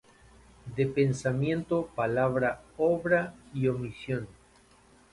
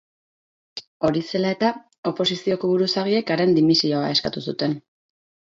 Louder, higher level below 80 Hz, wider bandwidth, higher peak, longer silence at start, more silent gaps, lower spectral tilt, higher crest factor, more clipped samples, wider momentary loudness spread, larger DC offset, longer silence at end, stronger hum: second, -29 LUFS vs -21 LUFS; about the same, -58 dBFS vs -60 dBFS; first, 11.5 kHz vs 7.8 kHz; second, -12 dBFS vs -4 dBFS; about the same, 0.65 s vs 0.75 s; second, none vs 0.87-1.00 s, 1.98-2.03 s; first, -7.5 dB/octave vs -5.5 dB/octave; about the same, 18 dB vs 18 dB; neither; about the same, 9 LU vs 11 LU; neither; first, 0.8 s vs 0.65 s; neither